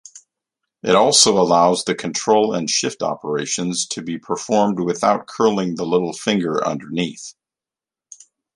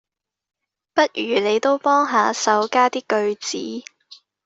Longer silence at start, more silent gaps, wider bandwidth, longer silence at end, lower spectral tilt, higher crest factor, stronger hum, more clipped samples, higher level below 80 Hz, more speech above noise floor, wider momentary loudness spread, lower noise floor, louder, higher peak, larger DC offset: second, 0.15 s vs 0.95 s; neither; first, 11.5 kHz vs 8 kHz; first, 1.25 s vs 0.65 s; about the same, -3.5 dB/octave vs -2.5 dB/octave; about the same, 20 dB vs 18 dB; neither; neither; first, -60 dBFS vs -70 dBFS; first, 71 dB vs 30 dB; first, 12 LU vs 9 LU; first, -90 dBFS vs -49 dBFS; about the same, -18 LUFS vs -19 LUFS; about the same, 0 dBFS vs -2 dBFS; neither